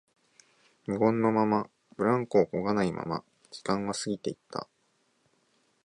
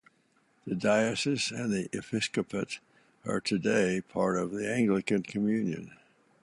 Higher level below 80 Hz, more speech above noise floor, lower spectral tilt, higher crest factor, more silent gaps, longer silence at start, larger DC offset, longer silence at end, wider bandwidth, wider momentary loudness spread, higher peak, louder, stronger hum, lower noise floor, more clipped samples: about the same, -66 dBFS vs -66 dBFS; first, 44 dB vs 39 dB; about the same, -6 dB/octave vs -5 dB/octave; about the same, 20 dB vs 18 dB; neither; first, 0.9 s vs 0.65 s; neither; first, 1.2 s vs 0.5 s; about the same, 11.5 kHz vs 11.5 kHz; first, 15 LU vs 11 LU; first, -10 dBFS vs -14 dBFS; about the same, -29 LUFS vs -30 LUFS; neither; about the same, -72 dBFS vs -69 dBFS; neither